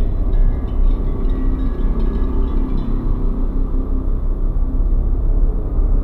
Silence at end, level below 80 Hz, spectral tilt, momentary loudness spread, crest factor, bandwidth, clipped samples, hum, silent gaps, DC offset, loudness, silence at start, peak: 0 s; -16 dBFS; -10.5 dB/octave; 3 LU; 10 dB; 2.1 kHz; under 0.1%; none; none; under 0.1%; -22 LUFS; 0 s; -6 dBFS